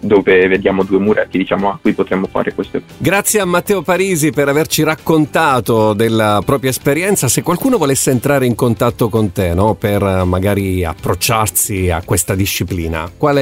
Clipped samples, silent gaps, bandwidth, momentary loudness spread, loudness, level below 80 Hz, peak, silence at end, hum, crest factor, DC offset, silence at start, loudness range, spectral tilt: under 0.1%; none; 16.5 kHz; 5 LU; -14 LUFS; -36 dBFS; -2 dBFS; 0 s; none; 12 dB; under 0.1%; 0 s; 2 LU; -5 dB/octave